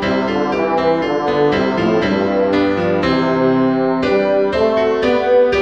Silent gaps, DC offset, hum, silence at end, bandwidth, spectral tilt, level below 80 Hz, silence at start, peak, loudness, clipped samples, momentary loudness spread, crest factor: none; 0.3%; none; 0 s; 8 kHz; -7 dB/octave; -42 dBFS; 0 s; -4 dBFS; -15 LUFS; under 0.1%; 3 LU; 12 dB